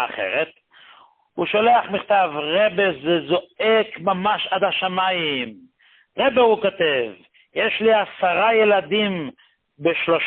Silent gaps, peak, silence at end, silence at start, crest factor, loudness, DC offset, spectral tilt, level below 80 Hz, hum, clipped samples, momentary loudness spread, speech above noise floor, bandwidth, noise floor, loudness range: none; -4 dBFS; 0 s; 0 s; 16 dB; -20 LUFS; under 0.1%; -9.5 dB/octave; -62 dBFS; none; under 0.1%; 10 LU; 32 dB; 4.4 kHz; -51 dBFS; 2 LU